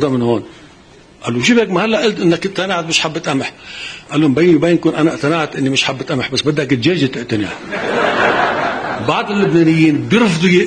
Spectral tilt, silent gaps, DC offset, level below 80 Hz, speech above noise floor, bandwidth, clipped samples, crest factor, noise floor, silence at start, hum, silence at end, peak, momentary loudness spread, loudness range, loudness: -5 dB/octave; none; under 0.1%; -50 dBFS; 28 dB; 10 kHz; under 0.1%; 14 dB; -43 dBFS; 0 s; none; 0 s; 0 dBFS; 9 LU; 2 LU; -14 LUFS